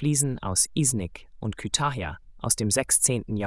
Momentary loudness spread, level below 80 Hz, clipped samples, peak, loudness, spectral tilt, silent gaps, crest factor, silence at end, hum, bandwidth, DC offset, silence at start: 15 LU; -48 dBFS; under 0.1%; -6 dBFS; -24 LUFS; -3.5 dB/octave; none; 20 dB; 0 s; none; 12 kHz; under 0.1%; 0 s